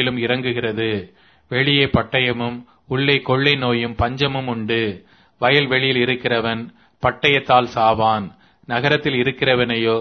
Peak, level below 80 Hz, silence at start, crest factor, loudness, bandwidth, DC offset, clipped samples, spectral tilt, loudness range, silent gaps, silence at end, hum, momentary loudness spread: 0 dBFS; -44 dBFS; 0 s; 20 dB; -18 LUFS; 6.4 kHz; under 0.1%; under 0.1%; -7 dB/octave; 2 LU; none; 0 s; none; 10 LU